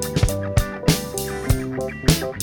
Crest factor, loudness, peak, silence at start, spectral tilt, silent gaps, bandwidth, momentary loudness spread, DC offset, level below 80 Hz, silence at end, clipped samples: 20 dB; -22 LUFS; -2 dBFS; 0 s; -5 dB/octave; none; over 20 kHz; 6 LU; under 0.1%; -28 dBFS; 0 s; under 0.1%